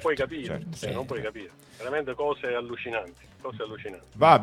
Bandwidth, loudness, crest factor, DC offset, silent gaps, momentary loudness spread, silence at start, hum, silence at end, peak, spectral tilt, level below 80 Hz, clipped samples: 15 kHz; -30 LUFS; 26 dB; under 0.1%; none; 13 LU; 0 s; none; 0 s; -2 dBFS; -5.5 dB/octave; -58 dBFS; under 0.1%